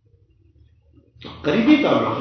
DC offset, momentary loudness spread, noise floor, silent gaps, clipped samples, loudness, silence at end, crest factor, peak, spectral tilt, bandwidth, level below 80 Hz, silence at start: under 0.1%; 24 LU; -56 dBFS; none; under 0.1%; -18 LUFS; 0 s; 18 dB; -2 dBFS; -7 dB/octave; 6.4 kHz; -52 dBFS; 1.2 s